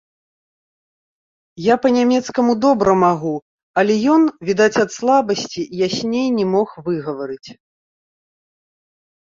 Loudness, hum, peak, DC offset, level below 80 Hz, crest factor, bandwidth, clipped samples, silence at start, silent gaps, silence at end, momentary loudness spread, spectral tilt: -17 LUFS; none; -2 dBFS; under 0.1%; -58 dBFS; 16 dB; 7.6 kHz; under 0.1%; 1.55 s; 3.42-3.74 s; 1.8 s; 11 LU; -5.5 dB/octave